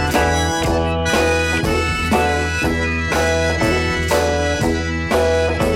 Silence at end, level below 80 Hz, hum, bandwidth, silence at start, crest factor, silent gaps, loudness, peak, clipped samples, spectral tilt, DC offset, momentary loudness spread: 0 s; -28 dBFS; none; 16.5 kHz; 0 s; 14 dB; none; -17 LUFS; -2 dBFS; under 0.1%; -4.5 dB/octave; under 0.1%; 2 LU